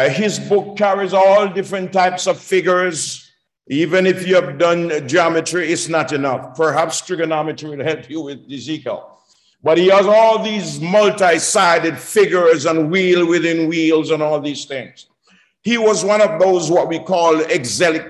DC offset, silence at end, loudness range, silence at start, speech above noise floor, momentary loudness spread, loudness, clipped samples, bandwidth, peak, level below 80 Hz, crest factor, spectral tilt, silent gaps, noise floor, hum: under 0.1%; 0 s; 6 LU; 0 s; 40 dB; 12 LU; -15 LUFS; under 0.1%; 12.5 kHz; -2 dBFS; -64 dBFS; 14 dB; -4 dB/octave; none; -56 dBFS; none